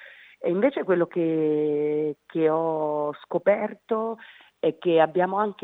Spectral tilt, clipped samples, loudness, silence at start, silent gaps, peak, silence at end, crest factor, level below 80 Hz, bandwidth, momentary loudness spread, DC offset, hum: -9 dB/octave; under 0.1%; -25 LUFS; 0 s; none; -8 dBFS; 0.1 s; 18 dB; -82 dBFS; 4 kHz; 7 LU; under 0.1%; none